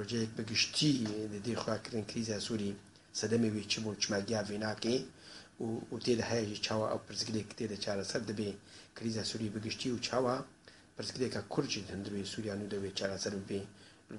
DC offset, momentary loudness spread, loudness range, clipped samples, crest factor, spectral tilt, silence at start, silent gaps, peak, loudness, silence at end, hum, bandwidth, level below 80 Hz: under 0.1%; 10 LU; 3 LU; under 0.1%; 20 dB; -4 dB/octave; 0 s; none; -16 dBFS; -36 LUFS; 0 s; none; 11.5 kHz; -68 dBFS